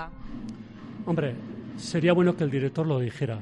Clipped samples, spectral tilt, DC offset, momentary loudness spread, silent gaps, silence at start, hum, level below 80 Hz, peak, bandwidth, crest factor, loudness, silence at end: under 0.1%; -7 dB/octave; under 0.1%; 18 LU; none; 0 s; none; -52 dBFS; -10 dBFS; 11 kHz; 18 dB; -26 LUFS; 0 s